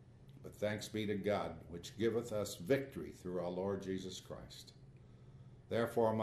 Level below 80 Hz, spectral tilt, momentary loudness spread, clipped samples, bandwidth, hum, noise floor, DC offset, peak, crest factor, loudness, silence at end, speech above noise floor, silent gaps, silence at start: -66 dBFS; -5.5 dB/octave; 22 LU; under 0.1%; 13.5 kHz; none; -59 dBFS; under 0.1%; -20 dBFS; 20 dB; -40 LUFS; 0 s; 20 dB; none; 0 s